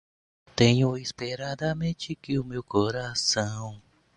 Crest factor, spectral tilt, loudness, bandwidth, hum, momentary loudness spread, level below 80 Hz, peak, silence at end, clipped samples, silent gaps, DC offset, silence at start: 22 dB; -5 dB/octave; -27 LUFS; 11 kHz; none; 13 LU; -56 dBFS; -6 dBFS; 0.35 s; under 0.1%; none; under 0.1%; 0.55 s